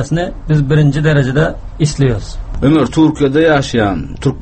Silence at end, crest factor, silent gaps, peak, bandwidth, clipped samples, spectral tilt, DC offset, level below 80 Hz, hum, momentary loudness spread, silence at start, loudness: 0 s; 12 dB; none; 0 dBFS; 8.8 kHz; under 0.1%; -7 dB/octave; under 0.1%; -28 dBFS; none; 7 LU; 0 s; -13 LUFS